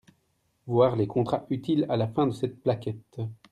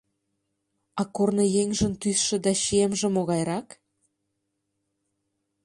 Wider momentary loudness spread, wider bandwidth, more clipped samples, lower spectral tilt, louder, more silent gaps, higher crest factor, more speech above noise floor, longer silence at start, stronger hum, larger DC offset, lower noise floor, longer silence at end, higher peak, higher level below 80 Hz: first, 13 LU vs 9 LU; about the same, 11 kHz vs 11.5 kHz; neither; first, -8.5 dB/octave vs -4.5 dB/octave; second, -27 LUFS vs -24 LUFS; neither; about the same, 18 dB vs 18 dB; second, 45 dB vs 54 dB; second, 0.65 s vs 0.95 s; neither; neither; second, -72 dBFS vs -79 dBFS; second, 0.2 s vs 2 s; about the same, -10 dBFS vs -10 dBFS; second, -64 dBFS vs -54 dBFS